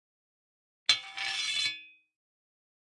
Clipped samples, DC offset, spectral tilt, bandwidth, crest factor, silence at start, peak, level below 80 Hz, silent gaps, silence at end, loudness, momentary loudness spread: under 0.1%; under 0.1%; 2.5 dB/octave; 11.5 kHz; 28 dB; 0.9 s; -8 dBFS; -86 dBFS; none; 1.1 s; -29 LUFS; 6 LU